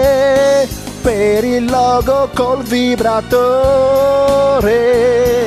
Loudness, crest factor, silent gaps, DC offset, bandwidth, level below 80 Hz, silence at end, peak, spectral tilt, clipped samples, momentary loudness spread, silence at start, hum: -12 LUFS; 10 dB; none; under 0.1%; 16 kHz; -32 dBFS; 0 s; -2 dBFS; -5 dB/octave; under 0.1%; 4 LU; 0 s; none